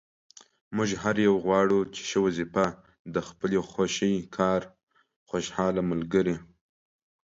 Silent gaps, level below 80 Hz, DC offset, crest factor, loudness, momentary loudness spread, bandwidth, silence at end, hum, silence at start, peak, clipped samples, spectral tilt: 2.99-3.05 s, 4.83-4.87 s, 5.16-5.26 s; -58 dBFS; under 0.1%; 18 dB; -27 LUFS; 10 LU; 7.8 kHz; 0.85 s; none; 0.7 s; -10 dBFS; under 0.1%; -5.5 dB/octave